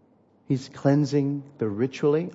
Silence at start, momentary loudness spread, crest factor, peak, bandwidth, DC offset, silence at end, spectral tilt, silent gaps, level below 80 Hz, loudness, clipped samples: 0.5 s; 8 LU; 18 dB; -8 dBFS; 8 kHz; under 0.1%; 0 s; -8 dB/octave; none; -70 dBFS; -25 LUFS; under 0.1%